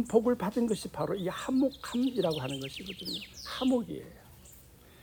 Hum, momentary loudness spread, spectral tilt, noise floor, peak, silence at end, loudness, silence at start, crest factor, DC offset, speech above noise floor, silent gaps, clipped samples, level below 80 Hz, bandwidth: none; 12 LU; -5.5 dB/octave; -55 dBFS; -12 dBFS; 0 s; -32 LUFS; 0 s; 20 dB; under 0.1%; 24 dB; none; under 0.1%; -60 dBFS; 19.5 kHz